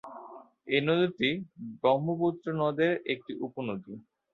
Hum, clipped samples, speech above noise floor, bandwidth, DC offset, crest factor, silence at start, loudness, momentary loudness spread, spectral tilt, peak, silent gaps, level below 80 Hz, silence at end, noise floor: none; under 0.1%; 20 dB; 6.2 kHz; under 0.1%; 18 dB; 0.05 s; -29 LUFS; 20 LU; -8 dB/octave; -12 dBFS; none; -72 dBFS; 0.35 s; -49 dBFS